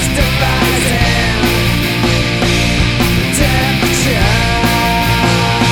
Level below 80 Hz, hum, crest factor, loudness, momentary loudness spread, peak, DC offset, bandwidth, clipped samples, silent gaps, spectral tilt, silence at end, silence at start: -20 dBFS; none; 12 dB; -12 LUFS; 1 LU; 0 dBFS; under 0.1%; 19.5 kHz; under 0.1%; none; -4.5 dB/octave; 0 s; 0 s